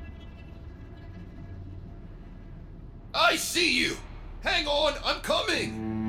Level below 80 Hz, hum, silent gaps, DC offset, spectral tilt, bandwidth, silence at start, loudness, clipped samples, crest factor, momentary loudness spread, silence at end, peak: -44 dBFS; none; none; under 0.1%; -3 dB/octave; 16.5 kHz; 0 s; -26 LUFS; under 0.1%; 20 dB; 23 LU; 0 s; -10 dBFS